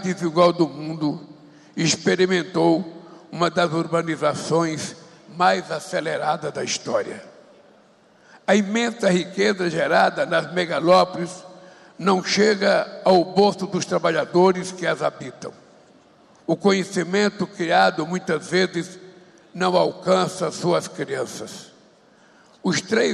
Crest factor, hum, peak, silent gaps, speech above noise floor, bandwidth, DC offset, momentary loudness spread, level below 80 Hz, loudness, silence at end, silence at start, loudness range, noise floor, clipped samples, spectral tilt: 16 dB; none; -6 dBFS; none; 34 dB; 12.5 kHz; under 0.1%; 14 LU; -66 dBFS; -21 LUFS; 0 s; 0 s; 5 LU; -54 dBFS; under 0.1%; -4.5 dB/octave